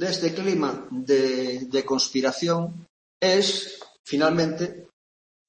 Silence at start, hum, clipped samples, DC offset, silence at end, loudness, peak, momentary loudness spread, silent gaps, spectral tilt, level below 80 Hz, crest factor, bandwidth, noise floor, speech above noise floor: 0 s; none; under 0.1%; under 0.1%; 0.65 s; -24 LUFS; -8 dBFS; 11 LU; 2.89-3.20 s, 3.99-4.04 s; -4 dB/octave; -66 dBFS; 18 dB; 8.8 kHz; under -90 dBFS; over 66 dB